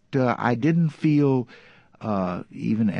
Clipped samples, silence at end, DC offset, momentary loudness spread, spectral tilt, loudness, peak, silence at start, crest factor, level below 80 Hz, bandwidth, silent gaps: under 0.1%; 0 s; under 0.1%; 9 LU; -9 dB/octave; -23 LUFS; -6 dBFS; 0.1 s; 18 dB; -58 dBFS; 7 kHz; none